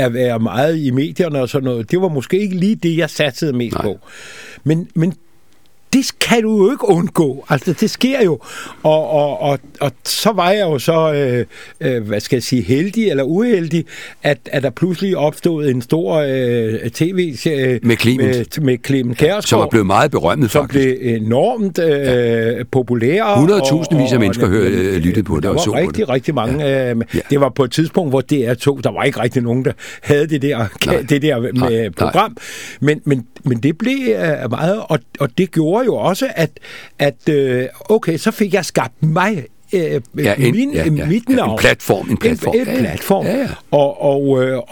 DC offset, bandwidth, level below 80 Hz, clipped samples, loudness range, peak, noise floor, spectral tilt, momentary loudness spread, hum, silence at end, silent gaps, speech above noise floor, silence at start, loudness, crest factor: 0.7%; 19 kHz; -42 dBFS; under 0.1%; 3 LU; 0 dBFS; -55 dBFS; -6 dB/octave; 6 LU; none; 0.1 s; none; 40 dB; 0 s; -16 LUFS; 16 dB